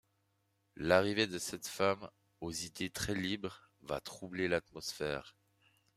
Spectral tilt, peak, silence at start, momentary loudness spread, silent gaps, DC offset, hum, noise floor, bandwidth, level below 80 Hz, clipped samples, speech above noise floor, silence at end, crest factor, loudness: -4 dB/octave; -14 dBFS; 0.75 s; 13 LU; none; under 0.1%; none; -78 dBFS; 15.5 kHz; -64 dBFS; under 0.1%; 42 dB; 0.65 s; 24 dB; -37 LUFS